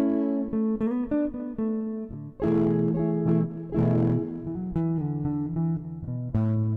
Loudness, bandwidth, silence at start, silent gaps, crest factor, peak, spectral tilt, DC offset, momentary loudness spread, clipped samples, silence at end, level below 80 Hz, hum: -27 LUFS; 3.5 kHz; 0 s; none; 14 dB; -12 dBFS; -12 dB/octave; under 0.1%; 9 LU; under 0.1%; 0 s; -50 dBFS; none